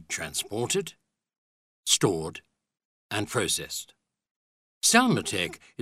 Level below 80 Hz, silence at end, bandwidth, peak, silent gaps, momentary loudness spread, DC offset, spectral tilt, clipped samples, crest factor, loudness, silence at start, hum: -62 dBFS; 0 s; 16 kHz; -6 dBFS; 1.38-1.83 s, 2.85-3.09 s, 4.31-4.81 s; 15 LU; under 0.1%; -2.5 dB/octave; under 0.1%; 24 dB; -26 LUFS; 0 s; none